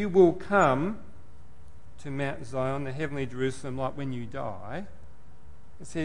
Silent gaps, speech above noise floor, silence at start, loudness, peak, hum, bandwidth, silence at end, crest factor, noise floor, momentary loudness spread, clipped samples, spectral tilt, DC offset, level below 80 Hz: none; 25 dB; 0 s; -29 LUFS; -8 dBFS; none; 11 kHz; 0 s; 20 dB; -53 dBFS; 18 LU; under 0.1%; -7 dB/octave; 2%; -54 dBFS